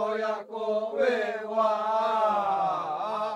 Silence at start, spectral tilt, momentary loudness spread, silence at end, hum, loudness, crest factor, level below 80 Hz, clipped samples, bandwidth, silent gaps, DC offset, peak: 0 s; -5 dB/octave; 5 LU; 0 s; none; -27 LUFS; 14 dB; -80 dBFS; under 0.1%; 10.5 kHz; none; under 0.1%; -14 dBFS